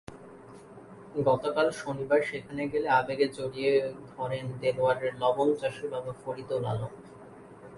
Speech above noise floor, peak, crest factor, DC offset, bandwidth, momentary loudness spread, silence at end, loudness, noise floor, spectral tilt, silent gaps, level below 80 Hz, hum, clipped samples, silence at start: 20 dB; -12 dBFS; 18 dB; under 0.1%; 11.5 kHz; 23 LU; 0 s; -29 LUFS; -49 dBFS; -6 dB/octave; none; -64 dBFS; none; under 0.1%; 0.1 s